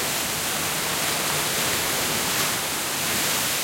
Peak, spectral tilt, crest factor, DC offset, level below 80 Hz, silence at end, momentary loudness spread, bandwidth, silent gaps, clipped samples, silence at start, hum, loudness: -10 dBFS; -1 dB/octave; 14 dB; under 0.1%; -54 dBFS; 0 s; 2 LU; 16.5 kHz; none; under 0.1%; 0 s; none; -22 LUFS